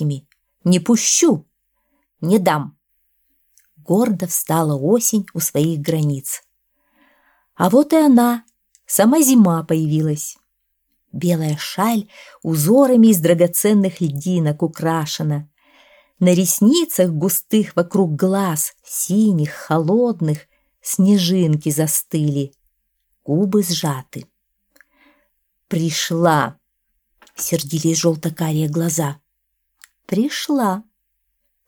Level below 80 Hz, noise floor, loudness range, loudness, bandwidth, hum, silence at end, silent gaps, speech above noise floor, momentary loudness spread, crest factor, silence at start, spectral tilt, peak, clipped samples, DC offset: -64 dBFS; -71 dBFS; 6 LU; -17 LUFS; 19.5 kHz; none; 0.85 s; none; 55 dB; 12 LU; 16 dB; 0 s; -5 dB/octave; -2 dBFS; under 0.1%; under 0.1%